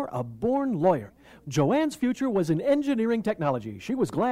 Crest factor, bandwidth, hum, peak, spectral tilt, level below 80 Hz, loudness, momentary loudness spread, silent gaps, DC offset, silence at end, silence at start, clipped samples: 14 dB; 15 kHz; none; -12 dBFS; -7 dB/octave; -60 dBFS; -26 LUFS; 8 LU; none; under 0.1%; 0 s; 0 s; under 0.1%